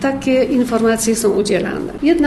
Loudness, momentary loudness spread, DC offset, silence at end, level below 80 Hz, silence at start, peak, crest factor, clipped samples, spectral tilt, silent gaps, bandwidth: -16 LUFS; 4 LU; under 0.1%; 0 s; -42 dBFS; 0 s; -4 dBFS; 12 dB; under 0.1%; -4.5 dB/octave; none; 13 kHz